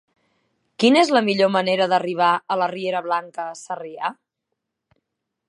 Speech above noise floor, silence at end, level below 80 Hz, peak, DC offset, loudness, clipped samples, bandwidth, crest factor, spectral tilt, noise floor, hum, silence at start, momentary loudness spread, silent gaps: 60 dB; 1.35 s; -76 dBFS; -2 dBFS; under 0.1%; -20 LUFS; under 0.1%; 11.5 kHz; 20 dB; -4.5 dB/octave; -80 dBFS; none; 0.8 s; 15 LU; none